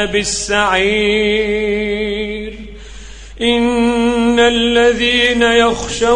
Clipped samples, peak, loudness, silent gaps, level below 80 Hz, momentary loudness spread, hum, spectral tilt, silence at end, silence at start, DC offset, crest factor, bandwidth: under 0.1%; 0 dBFS; -13 LUFS; none; -34 dBFS; 9 LU; none; -3 dB/octave; 0 s; 0 s; under 0.1%; 14 dB; 10.5 kHz